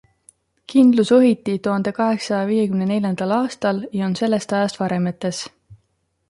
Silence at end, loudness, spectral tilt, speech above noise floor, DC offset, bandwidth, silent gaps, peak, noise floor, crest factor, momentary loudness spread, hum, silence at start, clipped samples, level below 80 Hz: 0.55 s; -19 LUFS; -6.5 dB/octave; 50 dB; under 0.1%; 11.5 kHz; none; -4 dBFS; -68 dBFS; 16 dB; 9 LU; none; 0.7 s; under 0.1%; -62 dBFS